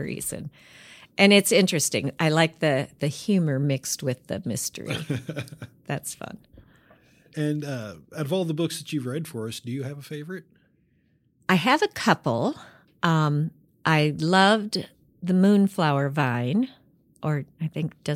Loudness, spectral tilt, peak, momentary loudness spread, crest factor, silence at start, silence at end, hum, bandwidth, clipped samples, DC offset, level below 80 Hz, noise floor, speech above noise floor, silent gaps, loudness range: -24 LUFS; -5 dB/octave; -4 dBFS; 16 LU; 22 dB; 0 s; 0 s; none; 16 kHz; under 0.1%; under 0.1%; -64 dBFS; -65 dBFS; 41 dB; none; 10 LU